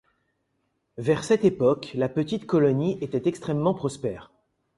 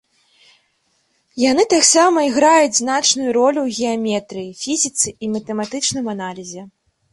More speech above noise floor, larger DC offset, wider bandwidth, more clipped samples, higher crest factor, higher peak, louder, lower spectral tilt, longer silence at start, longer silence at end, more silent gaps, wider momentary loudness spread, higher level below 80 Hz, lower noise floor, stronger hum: about the same, 50 dB vs 47 dB; neither; about the same, 11.5 kHz vs 11.5 kHz; neither; about the same, 18 dB vs 18 dB; second, -8 dBFS vs 0 dBFS; second, -25 LUFS vs -16 LUFS; first, -7 dB/octave vs -2 dB/octave; second, 1 s vs 1.35 s; about the same, 0.55 s vs 0.45 s; neither; second, 10 LU vs 16 LU; about the same, -60 dBFS vs -60 dBFS; first, -74 dBFS vs -64 dBFS; neither